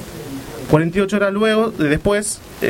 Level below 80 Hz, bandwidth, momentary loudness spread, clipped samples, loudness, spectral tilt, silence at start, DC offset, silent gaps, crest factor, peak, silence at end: -40 dBFS; 17 kHz; 14 LU; under 0.1%; -17 LUFS; -5 dB/octave; 0 s; under 0.1%; none; 18 dB; 0 dBFS; 0 s